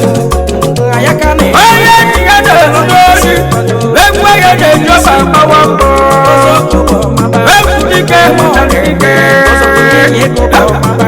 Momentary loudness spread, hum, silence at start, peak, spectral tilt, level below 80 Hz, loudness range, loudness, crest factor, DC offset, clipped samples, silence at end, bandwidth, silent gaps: 5 LU; none; 0 s; 0 dBFS; -4.5 dB/octave; -18 dBFS; 1 LU; -5 LUFS; 6 dB; under 0.1%; 4%; 0 s; over 20 kHz; none